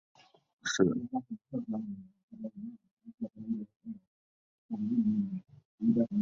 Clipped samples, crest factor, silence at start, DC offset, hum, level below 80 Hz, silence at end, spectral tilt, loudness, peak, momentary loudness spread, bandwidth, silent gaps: under 0.1%; 24 dB; 0.65 s; under 0.1%; none; -70 dBFS; 0 s; -5.5 dB/octave; -34 LUFS; -12 dBFS; 18 LU; 7.6 kHz; 2.23-2.28 s, 2.91-2.97 s, 3.76-3.80 s, 4.07-4.69 s, 5.65-5.78 s